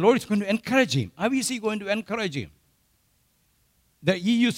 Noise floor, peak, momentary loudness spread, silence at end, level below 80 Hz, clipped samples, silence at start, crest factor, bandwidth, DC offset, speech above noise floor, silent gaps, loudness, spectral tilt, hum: -67 dBFS; -6 dBFS; 7 LU; 0 s; -62 dBFS; under 0.1%; 0 s; 20 dB; 16 kHz; under 0.1%; 43 dB; none; -25 LUFS; -5 dB/octave; none